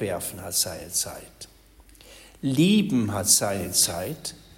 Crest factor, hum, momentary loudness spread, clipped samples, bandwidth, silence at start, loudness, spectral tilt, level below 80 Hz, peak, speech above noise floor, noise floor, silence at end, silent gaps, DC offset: 22 dB; none; 13 LU; under 0.1%; 16.5 kHz; 0 s; -23 LUFS; -3.5 dB/octave; -54 dBFS; -4 dBFS; 28 dB; -52 dBFS; 0.2 s; none; under 0.1%